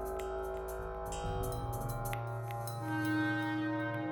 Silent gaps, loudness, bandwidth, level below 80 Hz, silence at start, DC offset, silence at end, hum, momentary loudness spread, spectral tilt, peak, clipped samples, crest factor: none; -37 LUFS; over 20 kHz; -48 dBFS; 0 s; under 0.1%; 0 s; none; 7 LU; -6 dB/octave; -20 dBFS; under 0.1%; 16 dB